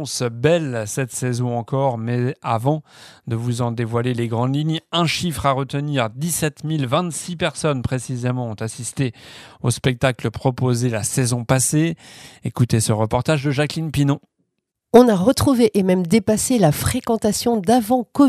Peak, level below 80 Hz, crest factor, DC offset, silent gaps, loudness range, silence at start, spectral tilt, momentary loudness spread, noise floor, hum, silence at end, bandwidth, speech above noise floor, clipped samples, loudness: 0 dBFS; -46 dBFS; 20 dB; under 0.1%; none; 6 LU; 0 s; -5.5 dB/octave; 9 LU; -76 dBFS; none; 0 s; 15.5 kHz; 57 dB; under 0.1%; -20 LUFS